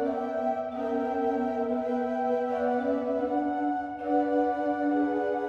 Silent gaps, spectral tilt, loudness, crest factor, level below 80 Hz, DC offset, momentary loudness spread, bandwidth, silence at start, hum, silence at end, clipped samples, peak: none; -7 dB/octave; -28 LUFS; 14 dB; -64 dBFS; under 0.1%; 3 LU; 7 kHz; 0 s; none; 0 s; under 0.1%; -14 dBFS